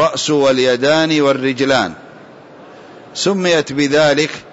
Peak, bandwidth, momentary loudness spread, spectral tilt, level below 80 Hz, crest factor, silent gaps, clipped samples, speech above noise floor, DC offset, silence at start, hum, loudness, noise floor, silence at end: -2 dBFS; 8 kHz; 5 LU; -4 dB/octave; -56 dBFS; 12 dB; none; under 0.1%; 24 dB; under 0.1%; 0 s; none; -14 LUFS; -38 dBFS; 0.05 s